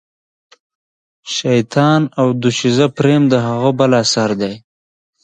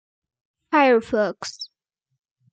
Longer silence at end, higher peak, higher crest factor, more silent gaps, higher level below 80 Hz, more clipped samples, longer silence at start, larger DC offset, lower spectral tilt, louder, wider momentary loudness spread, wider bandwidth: second, 0.65 s vs 0.85 s; first, 0 dBFS vs -6 dBFS; about the same, 16 dB vs 18 dB; neither; first, -56 dBFS vs -64 dBFS; neither; first, 1.25 s vs 0.7 s; neither; first, -5.5 dB/octave vs -4 dB/octave; first, -14 LUFS vs -20 LUFS; second, 8 LU vs 19 LU; about the same, 9.4 kHz vs 9 kHz